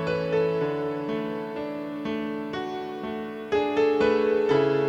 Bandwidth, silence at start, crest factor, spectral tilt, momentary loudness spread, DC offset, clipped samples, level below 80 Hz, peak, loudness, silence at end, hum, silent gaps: 7.6 kHz; 0 s; 16 dB; -7 dB/octave; 11 LU; under 0.1%; under 0.1%; -58 dBFS; -10 dBFS; -26 LUFS; 0 s; none; none